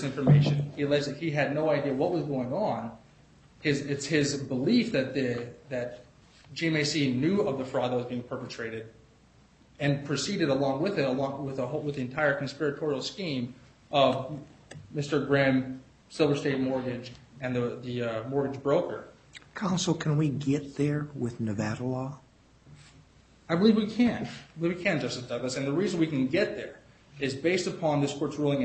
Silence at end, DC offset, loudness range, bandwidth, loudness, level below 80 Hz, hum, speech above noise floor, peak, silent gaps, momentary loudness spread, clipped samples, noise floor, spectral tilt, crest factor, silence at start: 0 s; under 0.1%; 3 LU; 8.4 kHz; -29 LUFS; -62 dBFS; none; 31 dB; -8 dBFS; none; 13 LU; under 0.1%; -59 dBFS; -6 dB/octave; 20 dB; 0 s